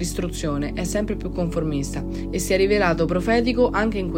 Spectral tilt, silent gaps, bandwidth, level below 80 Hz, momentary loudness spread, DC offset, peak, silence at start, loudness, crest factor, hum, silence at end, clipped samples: -5.5 dB/octave; none; 16 kHz; -32 dBFS; 8 LU; under 0.1%; -6 dBFS; 0 s; -22 LUFS; 16 dB; none; 0 s; under 0.1%